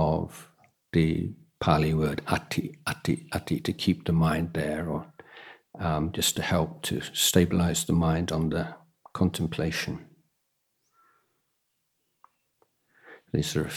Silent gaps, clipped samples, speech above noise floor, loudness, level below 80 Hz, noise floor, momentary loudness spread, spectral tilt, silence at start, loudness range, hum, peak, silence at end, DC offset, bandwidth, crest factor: none; under 0.1%; 50 dB; -27 LUFS; -48 dBFS; -77 dBFS; 13 LU; -5 dB/octave; 0 s; 8 LU; none; -6 dBFS; 0 s; under 0.1%; 17.5 kHz; 22 dB